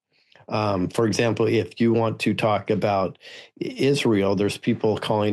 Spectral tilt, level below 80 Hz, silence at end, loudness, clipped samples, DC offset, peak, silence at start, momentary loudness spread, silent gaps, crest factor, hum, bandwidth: -6 dB/octave; -62 dBFS; 0 s; -23 LUFS; under 0.1%; under 0.1%; -8 dBFS; 0.5 s; 9 LU; none; 14 dB; none; 12.5 kHz